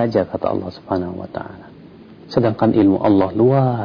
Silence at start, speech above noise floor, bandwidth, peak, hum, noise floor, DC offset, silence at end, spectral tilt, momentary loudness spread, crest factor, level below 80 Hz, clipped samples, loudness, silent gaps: 0 s; 24 dB; 5.4 kHz; -4 dBFS; none; -41 dBFS; under 0.1%; 0 s; -10 dB/octave; 15 LU; 14 dB; -50 dBFS; under 0.1%; -17 LUFS; none